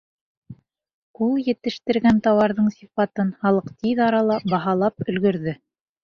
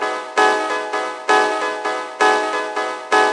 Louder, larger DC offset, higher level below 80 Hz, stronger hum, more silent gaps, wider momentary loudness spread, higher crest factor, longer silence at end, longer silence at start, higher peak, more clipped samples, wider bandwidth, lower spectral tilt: second, -21 LUFS vs -18 LUFS; neither; first, -56 dBFS vs -88 dBFS; neither; first, 0.94-1.14 s vs none; about the same, 8 LU vs 7 LU; about the same, 16 dB vs 16 dB; first, 0.5 s vs 0 s; first, 0.5 s vs 0 s; second, -6 dBFS vs -2 dBFS; neither; second, 6.8 kHz vs 11.5 kHz; first, -8 dB/octave vs -1 dB/octave